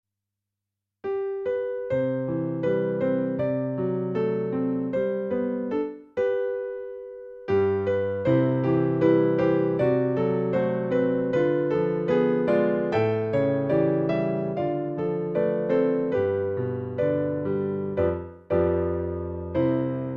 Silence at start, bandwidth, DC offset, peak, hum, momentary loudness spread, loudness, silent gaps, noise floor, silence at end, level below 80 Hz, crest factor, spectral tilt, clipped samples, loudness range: 1.05 s; 6.6 kHz; under 0.1%; -8 dBFS; none; 7 LU; -25 LUFS; none; -86 dBFS; 0 s; -58 dBFS; 16 dB; -10 dB/octave; under 0.1%; 4 LU